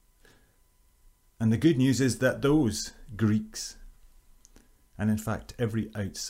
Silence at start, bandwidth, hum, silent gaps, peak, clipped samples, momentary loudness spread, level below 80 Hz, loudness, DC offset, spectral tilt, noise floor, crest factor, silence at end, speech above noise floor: 1.4 s; 16 kHz; none; none; -10 dBFS; under 0.1%; 12 LU; -52 dBFS; -28 LUFS; under 0.1%; -5.5 dB/octave; -63 dBFS; 18 dB; 0 s; 37 dB